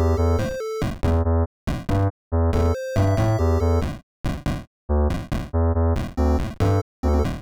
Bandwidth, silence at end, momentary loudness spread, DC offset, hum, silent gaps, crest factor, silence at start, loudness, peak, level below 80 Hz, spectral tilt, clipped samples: 13 kHz; 0 s; 8 LU; under 0.1%; none; 1.46-1.67 s, 2.10-2.31 s, 4.03-4.24 s, 4.67-4.88 s, 6.82-7.03 s; 12 dB; 0 s; -23 LUFS; -10 dBFS; -28 dBFS; -8 dB/octave; under 0.1%